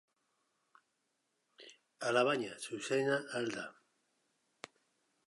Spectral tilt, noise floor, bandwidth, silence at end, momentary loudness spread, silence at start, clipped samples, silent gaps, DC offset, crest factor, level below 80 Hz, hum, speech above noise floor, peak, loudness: -4 dB/octave; -82 dBFS; 11.5 kHz; 1.55 s; 25 LU; 1.6 s; under 0.1%; none; under 0.1%; 22 dB; -90 dBFS; none; 47 dB; -18 dBFS; -36 LUFS